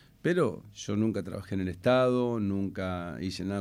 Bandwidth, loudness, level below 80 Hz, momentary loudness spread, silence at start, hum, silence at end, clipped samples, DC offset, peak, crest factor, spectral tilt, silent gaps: 15.5 kHz; -30 LUFS; -62 dBFS; 11 LU; 0.25 s; none; 0 s; under 0.1%; under 0.1%; -12 dBFS; 16 dB; -6.5 dB/octave; none